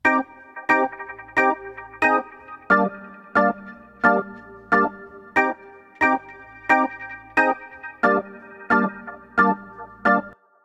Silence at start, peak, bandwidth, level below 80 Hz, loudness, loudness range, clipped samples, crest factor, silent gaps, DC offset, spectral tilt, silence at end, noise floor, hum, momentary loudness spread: 0.05 s; -2 dBFS; 12.5 kHz; -60 dBFS; -21 LUFS; 1 LU; under 0.1%; 20 dB; none; under 0.1%; -6.5 dB/octave; 0.35 s; -42 dBFS; none; 18 LU